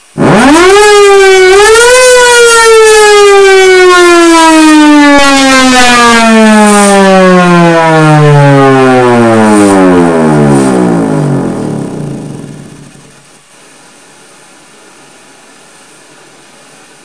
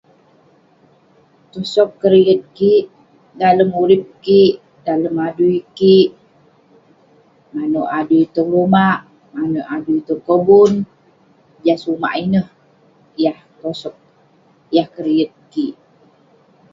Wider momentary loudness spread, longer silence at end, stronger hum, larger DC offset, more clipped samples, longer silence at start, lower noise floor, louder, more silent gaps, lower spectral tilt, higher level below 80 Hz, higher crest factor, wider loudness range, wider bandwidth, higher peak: second, 8 LU vs 15 LU; first, 4.4 s vs 1 s; neither; neither; first, 10% vs under 0.1%; second, 0.15 s vs 1.55 s; second, -37 dBFS vs -53 dBFS; first, -3 LUFS vs -15 LUFS; neither; second, -4.5 dB/octave vs -7.5 dB/octave; first, -34 dBFS vs -58 dBFS; second, 4 dB vs 16 dB; first, 11 LU vs 7 LU; first, 11 kHz vs 7.6 kHz; about the same, 0 dBFS vs 0 dBFS